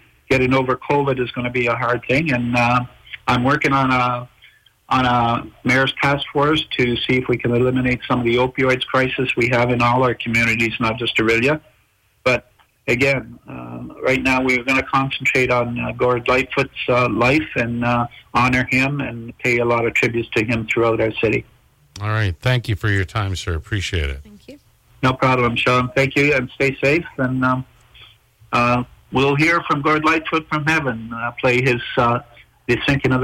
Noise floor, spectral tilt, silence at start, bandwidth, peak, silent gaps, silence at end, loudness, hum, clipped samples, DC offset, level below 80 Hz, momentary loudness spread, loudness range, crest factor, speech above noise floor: -60 dBFS; -6 dB/octave; 0.3 s; 16 kHz; -8 dBFS; none; 0 s; -18 LUFS; none; under 0.1%; under 0.1%; -42 dBFS; 7 LU; 3 LU; 12 dB; 42 dB